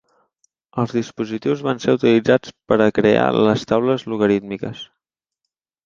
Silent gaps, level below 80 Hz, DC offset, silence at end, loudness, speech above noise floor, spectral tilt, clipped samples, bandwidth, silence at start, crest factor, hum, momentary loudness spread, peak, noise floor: none; -54 dBFS; under 0.1%; 1 s; -18 LUFS; 63 dB; -6.5 dB/octave; under 0.1%; 7.4 kHz; 0.75 s; 18 dB; none; 13 LU; -2 dBFS; -81 dBFS